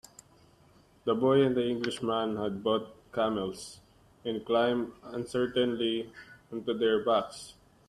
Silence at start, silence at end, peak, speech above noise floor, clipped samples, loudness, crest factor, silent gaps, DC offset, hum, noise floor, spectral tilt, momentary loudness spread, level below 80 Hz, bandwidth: 1.05 s; 0.4 s; -14 dBFS; 32 dB; under 0.1%; -30 LUFS; 18 dB; none; under 0.1%; none; -61 dBFS; -5.5 dB/octave; 16 LU; -66 dBFS; 13 kHz